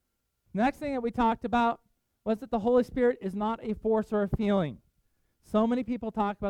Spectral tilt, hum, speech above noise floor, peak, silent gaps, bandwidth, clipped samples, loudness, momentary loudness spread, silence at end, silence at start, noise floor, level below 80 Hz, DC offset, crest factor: -8 dB/octave; none; 47 dB; -14 dBFS; none; 11.5 kHz; under 0.1%; -29 LUFS; 7 LU; 0 s; 0.55 s; -75 dBFS; -50 dBFS; under 0.1%; 16 dB